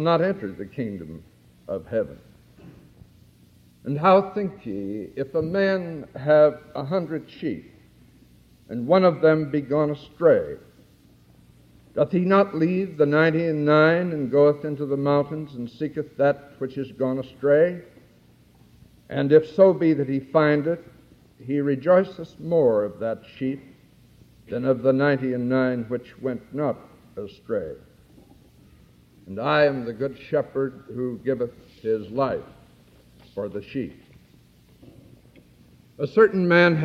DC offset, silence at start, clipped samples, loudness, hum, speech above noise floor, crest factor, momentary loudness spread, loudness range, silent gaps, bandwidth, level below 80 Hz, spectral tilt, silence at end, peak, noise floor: under 0.1%; 0 s; under 0.1%; -23 LUFS; none; 33 dB; 20 dB; 16 LU; 10 LU; none; 6.8 kHz; -60 dBFS; -8.5 dB/octave; 0 s; -4 dBFS; -55 dBFS